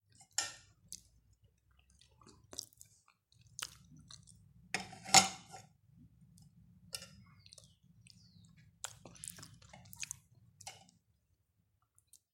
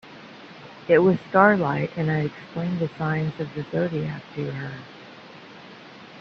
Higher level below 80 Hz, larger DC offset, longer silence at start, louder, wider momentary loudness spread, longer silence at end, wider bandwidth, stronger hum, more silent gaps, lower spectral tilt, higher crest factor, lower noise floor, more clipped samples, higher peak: second, -74 dBFS vs -60 dBFS; neither; first, 0.4 s vs 0.05 s; second, -36 LUFS vs -23 LUFS; about the same, 27 LU vs 25 LU; first, 1.65 s vs 0 s; first, 16.5 kHz vs 6.6 kHz; neither; neither; second, -0.5 dB/octave vs -8.5 dB/octave; first, 36 dB vs 24 dB; first, -79 dBFS vs -44 dBFS; neither; second, -6 dBFS vs -2 dBFS